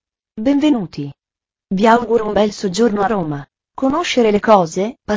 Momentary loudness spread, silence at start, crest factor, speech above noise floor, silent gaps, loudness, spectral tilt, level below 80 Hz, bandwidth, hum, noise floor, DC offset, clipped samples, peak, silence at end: 15 LU; 0.35 s; 16 dB; 74 dB; none; -16 LUFS; -5.5 dB/octave; -48 dBFS; 7.8 kHz; none; -89 dBFS; under 0.1%; under 0.1%; 0 dBFS; 0 s